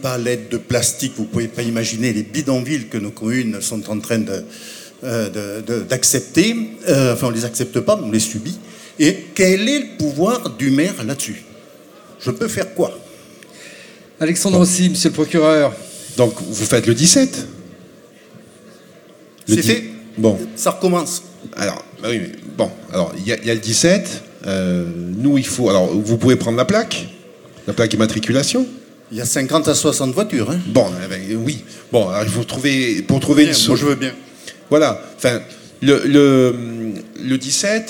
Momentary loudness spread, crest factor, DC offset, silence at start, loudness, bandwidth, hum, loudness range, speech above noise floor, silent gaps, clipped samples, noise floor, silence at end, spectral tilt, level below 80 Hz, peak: 13 LU; 18 dB; under 0.1%; 0 s; -17 LUFS; 19 kHz; none; 5 LU; 27 dB; none; under 0.1%; -44 dBFS; 0 s; -4.5 dB/octave; -56 dBFS; 0 dBFS